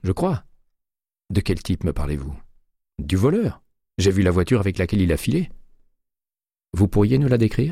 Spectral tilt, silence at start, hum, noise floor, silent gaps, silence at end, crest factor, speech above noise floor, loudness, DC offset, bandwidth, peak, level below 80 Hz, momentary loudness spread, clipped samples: -7 dB/octave; 0.05 s; none; under -90 dBFS; none; 0 s; 16 dB; over 70 dB; -21 LUFS; under 0.1%; 15 kHz; -6 dBFS; -36 dBFS; 14 LU; under 0.1%